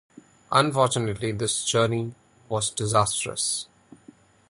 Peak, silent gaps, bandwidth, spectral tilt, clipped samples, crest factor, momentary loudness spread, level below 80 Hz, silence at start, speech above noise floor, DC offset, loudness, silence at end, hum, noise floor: -4 dBFS; none; 11.5 kHz; -3.5 dB/octave; under 0.1%; 22 dB; 9 LU; -56 dBFS; 0.5 s; 29 dB; under 0.1%; -24 LUFS; 0.85 s; none; -53 dBFS